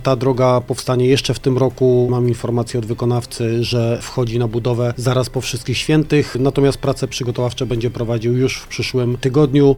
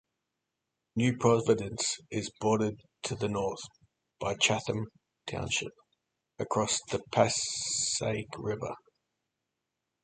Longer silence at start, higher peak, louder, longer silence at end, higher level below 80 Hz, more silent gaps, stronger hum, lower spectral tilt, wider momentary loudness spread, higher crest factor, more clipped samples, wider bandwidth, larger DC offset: second, 0 s vs 0.95 s; first, -2 dBFS vs -10 dBFS; first, -17 LUFS vs -31 LUFS; second, 0 s vs 1.3 s; first, -38 dBFS vs -60 dBFS; neither; neither; first, -6.5 dB/octave vs -3.5 dB/octave; second, 6 LU vs 14 LU; second, 16 dB vs 24 dB; neither; first, 14.5 kHz vs 9.6 kHz; neither